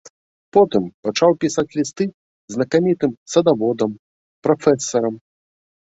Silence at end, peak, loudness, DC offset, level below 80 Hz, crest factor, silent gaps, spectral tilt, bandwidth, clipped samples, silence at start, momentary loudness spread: 0.8 s; -2 dBFS; -19 LUFS; under 0.1%; -60 dBFS; 18 dB; 0.10-0.52 s, 0.94-1.03 s, 2.14-2.48 s, 3.17-3.26 s, 3.99-4.42 s; -5.5 dB/octave; 8 kHz; under 0.1%; 0.05 s; 9 LU